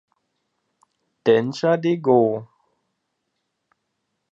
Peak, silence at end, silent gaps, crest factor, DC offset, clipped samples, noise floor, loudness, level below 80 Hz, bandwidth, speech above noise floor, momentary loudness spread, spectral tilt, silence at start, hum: -4 dBFS; 1.9 s; none; 20 dB; under 0.1%; under 0.1%; -76 dBFS; -20 LUFS; -74 dBFS; 7.8 kHz; 58 dB; 7 LU; -7 dB/octave; 1.25 s; none